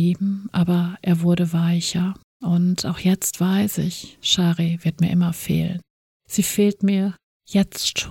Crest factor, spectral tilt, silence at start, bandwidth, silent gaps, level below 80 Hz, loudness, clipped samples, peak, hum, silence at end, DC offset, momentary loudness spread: 16 dB; -5 dB/octave; 0 s; 17 kHz; 2.24-2.40 s, 5.90-6.20 s, 7.24-7.40 s; -52 dBFS; -21 LUFS; under 0.1%; -4 dBFS; none; 0 s; under 0.1%; 7 LU